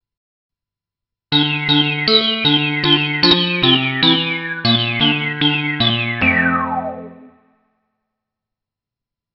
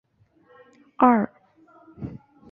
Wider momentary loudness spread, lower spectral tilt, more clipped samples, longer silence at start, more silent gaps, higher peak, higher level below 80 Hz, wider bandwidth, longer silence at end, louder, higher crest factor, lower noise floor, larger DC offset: second, 6 LU vs 20 LU; second, -2 dB/octave vs -10 dB/octave; neither; first, 1.3 s vs 1 s; neither; about the same, 0 dBFS vs -2 dBFS; first, -50 dBFS vs -58 dBFS; first, 6 kHz vs 3.4 kHz; first, 2.1 s vs 0.35 s; first, -14 LUFS vs -21 LUFS; second, 18 dB vs 24 dB; first, -86 dBFS vs -60 dBFS; neither